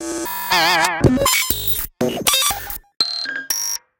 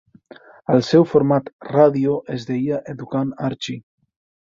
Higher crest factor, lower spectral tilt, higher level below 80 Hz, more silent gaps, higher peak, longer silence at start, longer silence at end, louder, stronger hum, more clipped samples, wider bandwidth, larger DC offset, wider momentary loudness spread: about the same, 20 dB vs 18 dB; second, -2.5 dB/octave vs -7.5 dB/octave; first, -38 dBFS vs -60 dBFS; second, none vs 1.53-1.59 s; about the same, 0 dBFS vs -2 dBFS; second, 0 s vs 0.7 s; second, 0.2 s vs 0.6 s; about the same, -17 LUFS vs -19 LUFS; neither; neither; first, 17.5 kHz vs 7.6 kHz; neither; second, 9 LU vs 13 LU